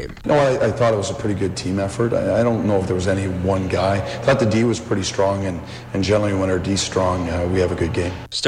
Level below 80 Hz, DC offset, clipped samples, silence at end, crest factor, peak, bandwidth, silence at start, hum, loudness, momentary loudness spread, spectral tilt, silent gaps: -44 dBFS; under 0.1%; under 0.1%; 0 s; 14 dB; -4 dBFS; 11.5 kHz; 0 s; none; -20 LUFS; 5 LU; -5.5 dB/octave; none